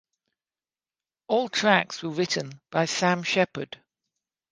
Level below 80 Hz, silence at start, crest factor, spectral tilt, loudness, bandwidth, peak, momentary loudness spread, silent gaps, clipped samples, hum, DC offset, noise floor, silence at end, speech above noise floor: -72 dBFS; 1.3 s; 26 dB; -4 dB/octave; -25 LUFS; 10 kHz; -2 dBFS; 11 LU; none; under 0.1%; none; under 0.1%; under -90 dBFS; 0.75 s; over 65 dB